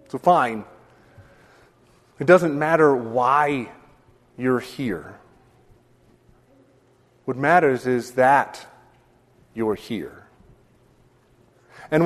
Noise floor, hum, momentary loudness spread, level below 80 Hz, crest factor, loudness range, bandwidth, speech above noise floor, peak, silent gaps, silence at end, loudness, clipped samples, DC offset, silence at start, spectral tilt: -58 dBFS; none; 17 LU; -60 dBFS; 22 dB; 11 LU; 13.5 kHz; 38 dB; -2 dBFS; none; 0 s; -20 LUFS; under 0.1%; under 0.1%; 0.15 s; -6.5 dB/octave